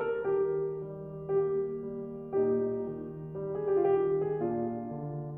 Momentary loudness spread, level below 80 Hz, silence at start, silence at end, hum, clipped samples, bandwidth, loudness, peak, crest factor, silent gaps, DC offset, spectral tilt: 12 LU; -64 dBFS; 0 s; 0 s; none; under 0.1%; 3 kHz; -32 LUFS; -18 dBFS; 14 dB; none; under 0.1%; -11.5 dB/octave